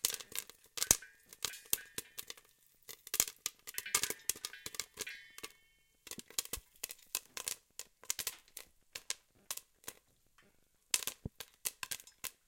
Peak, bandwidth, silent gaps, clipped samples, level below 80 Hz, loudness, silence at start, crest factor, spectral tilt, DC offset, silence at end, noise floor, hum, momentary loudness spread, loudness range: -6 dBFS; 17 kHz; none; under 0.1%; -66 dBFS; -39 LUFS; 0.05 s; 38 dB; 0.5 dB/octave; under 0.1%; 0.15 s; -71 dBFS; none; 18 LU; 7 LU